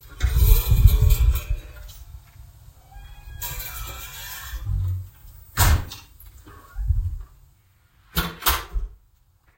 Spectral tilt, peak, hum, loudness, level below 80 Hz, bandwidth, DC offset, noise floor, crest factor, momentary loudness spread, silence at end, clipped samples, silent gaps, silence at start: -4 dB/octave; 0 dBFS; none; -24 LUFS; -24 dBFS; 16.5 kHz; under 0.1%; -59 dBFS; 24 dB; 24 LU; 0.65 s; under 0.1%; none; 0.05 s